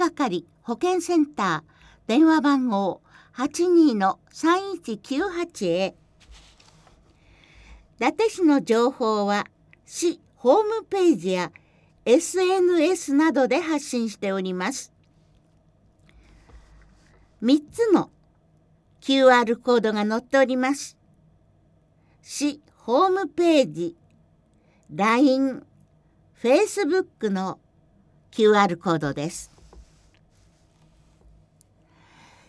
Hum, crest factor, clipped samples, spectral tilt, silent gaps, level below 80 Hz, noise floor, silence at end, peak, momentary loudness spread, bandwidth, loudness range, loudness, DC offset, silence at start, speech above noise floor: none; 20 dB; under 0.1%; -4.5 dB/octave; none; -60 dBFS; -60 dBFS; 2.7 s; -4 dBFS; 14 LU; 11 kHz; 7 LU; -22 LUFS; under 0.1%; 0 s; 39 dB